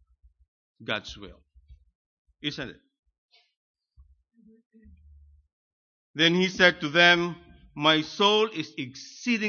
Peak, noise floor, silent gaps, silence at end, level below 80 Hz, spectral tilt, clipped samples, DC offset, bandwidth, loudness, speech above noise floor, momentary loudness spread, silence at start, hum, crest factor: -4 dBFS; -60 dBFS; 1.95-2.25 s, 2.99-3.03 s, 3.18-3.28 s, 3.57-3.74 s, 4.66-4.70 s, 5.53-6.14 s; 0 s; -60 dBFS; -4 dB/octave; under 0.1%; under 0.1%; 7.2 kHz; -23 LUFS; 35 dB; 22 LU; 0.8 s; none; 24 dB